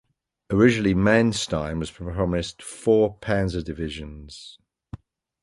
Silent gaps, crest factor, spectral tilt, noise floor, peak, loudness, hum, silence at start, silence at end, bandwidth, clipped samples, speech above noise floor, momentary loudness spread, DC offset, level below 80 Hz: none; 20 dB; -6 dB/octave; -43 dBFS; -4 dBFS; -23 LUFS; none; 0.5 s; 0.45 s; 11.5 kHz; under 0.1%; 20 dB; 22 LU; under 0.1%; -42 dBFS